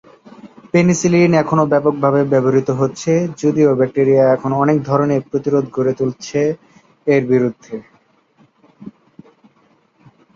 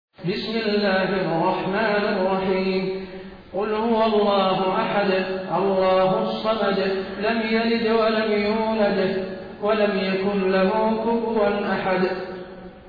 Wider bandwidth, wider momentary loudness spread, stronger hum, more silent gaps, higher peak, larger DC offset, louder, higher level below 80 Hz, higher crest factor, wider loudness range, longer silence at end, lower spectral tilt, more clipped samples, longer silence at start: first, 7.8 kHz vs 5.2 kHz; about the same, 8 LU vs 9 LU; neither; neither; first, -2 dBFS vs -10 dBFS; neither; first, -15 LUFS vs -22 LUFS; about the same, -56 dBFS vs -52 dBFS; about the same, 14 dB vs 12 dB; first, 8 LU vs 2 LU; first, 1.45 s vs 0 s; about the same, -7 dB/octave vs -8 dB/octave; neither; first, 0.45 s vs 0.2 s